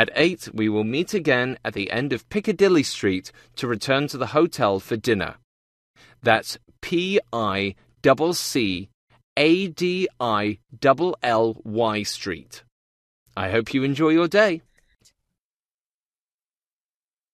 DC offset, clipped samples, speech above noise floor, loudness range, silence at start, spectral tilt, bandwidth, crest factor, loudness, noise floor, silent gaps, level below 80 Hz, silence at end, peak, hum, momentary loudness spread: under 0.1%; under 0.1%; over 68 dB; 2 LU; 0 s; -5 dB/octave; 14 kHz; 22 dB; -22 LUFS; under -90 dBFS; 5.44-5.94 s, 8.94-9.07 s, 9.24-9.36 s, 12.72-13.26 s; -58 dBFS; 2.75 s; 0 dBFS; none; 11 LU